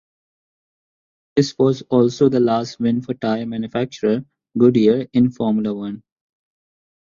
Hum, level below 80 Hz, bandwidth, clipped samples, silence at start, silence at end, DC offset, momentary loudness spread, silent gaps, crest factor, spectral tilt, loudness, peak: none; -58 dBFS; 7.4 kHz; under 0.1%; 1.35 s; 1.05 s; under 0.1%; 9 LU; none; 18 dB; -7 dB/octave; -19 LUFS; -2 dBFS